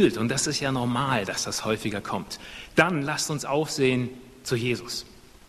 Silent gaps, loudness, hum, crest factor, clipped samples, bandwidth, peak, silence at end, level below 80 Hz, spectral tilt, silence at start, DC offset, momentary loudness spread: none; -26 LUFS; none; 24 dB; under 0.1%; 13.5 kHz; -4 dBFS; 0.35 s; -54 dBFS; -4 dB/octave; 0 s; under 0.1%; 12 LU